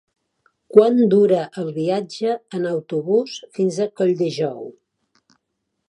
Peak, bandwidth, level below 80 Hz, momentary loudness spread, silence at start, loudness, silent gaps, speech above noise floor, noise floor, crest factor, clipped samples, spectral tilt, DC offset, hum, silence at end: 0 dBFS; 10.5 kHz; -72 dBFS; 11 LU; 0.75 s; -19 LUFS; none; 57 dB; -76 dBFS; 20 dB; under 0.1%; -7 dB/octave; under 0.1%; none; 1.15 s